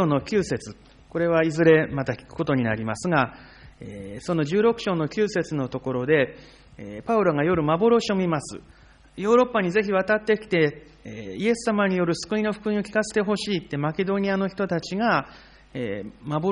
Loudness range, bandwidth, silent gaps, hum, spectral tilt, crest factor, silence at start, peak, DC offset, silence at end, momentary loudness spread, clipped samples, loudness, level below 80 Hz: 3 LU; 10.5 kHz; none; none; -6 dB/octave; 18 dB; 0 s; -6 dBFS; under 0.1%; 0 s; 16 LU; under 0.1%; -24 LUFS; -54 dBFS